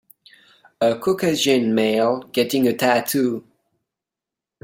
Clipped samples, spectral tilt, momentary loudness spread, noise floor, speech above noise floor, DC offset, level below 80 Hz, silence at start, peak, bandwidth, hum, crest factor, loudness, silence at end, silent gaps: under 0.1%; -4.5 dB/octave; 4 LU; -87 dBFS; 68 dB; under 0.1%; -64 dBFS; 0.8 s; -2 dBFS; 16.5 kHz; none; 18 dB; -19 LUFS; 1.25 s; none